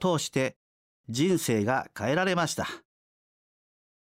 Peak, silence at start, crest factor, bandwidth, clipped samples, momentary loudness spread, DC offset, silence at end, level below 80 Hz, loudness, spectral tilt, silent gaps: -12 dBFS; 0 s; 16 dB; 16 kHz; under 0.1%; 9 LU; under 0.1%; 1.35 s; -66 dBFS; -28 LUFS; -4.5 dB/octave; 0.56-1.04 s